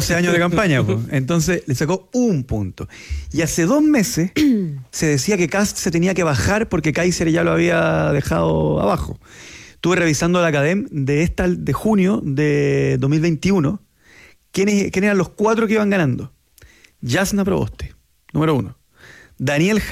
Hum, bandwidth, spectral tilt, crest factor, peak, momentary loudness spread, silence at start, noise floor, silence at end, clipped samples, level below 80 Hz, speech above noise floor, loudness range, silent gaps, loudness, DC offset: none; 16 kHz; -5.5 dB/octave; 12 dB; -6 dBFS; 10 LU; 0 s; -49 dBFS; 0 s; under 0.1%; -38 dBFS; 31 dB; 3 LU; none; -18 LUFS; under 0.1%